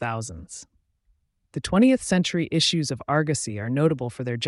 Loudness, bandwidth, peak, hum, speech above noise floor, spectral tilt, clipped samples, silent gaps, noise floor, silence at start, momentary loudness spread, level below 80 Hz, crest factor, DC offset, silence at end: -23 LUFS; 11.5 kHz; -8 dBFS; none; 44 dB; -5 dB/octave; under 0.1%; none; -68 dBFS; 0 s; 17 LU; -52 dBFS; 16 dB; under 0.1%; 0 s